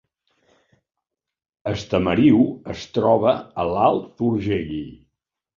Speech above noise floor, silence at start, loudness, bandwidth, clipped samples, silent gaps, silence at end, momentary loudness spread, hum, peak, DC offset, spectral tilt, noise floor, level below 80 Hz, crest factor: 63 dB; 1.65 s; -20 LUFS; 7.2 kHz; under 0.1%; none; 0.65 s; 15 LU; none; -4 dBFS; under 0.1%; -7.5 dB/octave; -83 dBFS; -48 dBFS; 18 dB